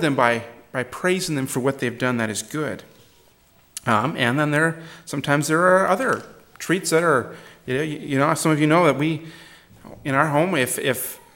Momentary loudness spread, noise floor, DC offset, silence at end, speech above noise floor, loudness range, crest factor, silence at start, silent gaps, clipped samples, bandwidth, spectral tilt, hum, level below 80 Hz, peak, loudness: 14 LU; -56 dBFS; under 0.1%; 0.2 s; 35 dB; 4 LU; 20 dB; 0 s; none; under 0.1%; 17.5 kHz; -5 dB/octave; none; -60 dBFS; -2 dBFS; -21 LUFS